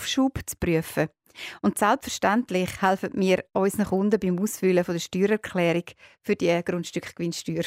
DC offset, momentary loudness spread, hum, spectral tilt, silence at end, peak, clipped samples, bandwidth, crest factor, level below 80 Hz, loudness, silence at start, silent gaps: under 0.1%; 7 LU; none; -5 dB/octave; 0 s; -8 dBFS; under 0.1%; 16 kHz; 16 dB; -52 dBFS; -25 LUFS; 0 s; none